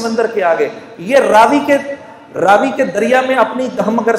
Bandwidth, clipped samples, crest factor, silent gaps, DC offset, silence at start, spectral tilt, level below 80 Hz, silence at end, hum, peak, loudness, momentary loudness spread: 15.5 kHz; under 0.1%; 12 dB; none; under 0.1%; 0 s; -4.5 dB/octave; -56 dBFS; 0 s; none; 0 dBFS; -12 LUFS; 13 LU